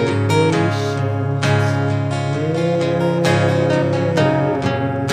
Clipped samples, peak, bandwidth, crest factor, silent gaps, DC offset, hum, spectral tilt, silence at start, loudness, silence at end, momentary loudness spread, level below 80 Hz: under 0.1%; -2 dBFS; 12 kHz; 14 dB; none; under 0.1%; none; -6.5 dB/octave; 0 s; -17 LUFS; 0 s; 4 LU; -54 dBFS